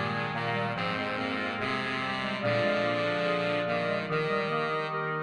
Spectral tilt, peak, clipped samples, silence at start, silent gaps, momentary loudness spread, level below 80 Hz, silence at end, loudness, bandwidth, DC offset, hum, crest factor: -6 dB/octave; -16 dBFS; under 0.1%; 0 s; none; 3 LU; -66 dBFS; 0 s; -29 LUFS; 11 kHz; under 0.1%; none; 14 dB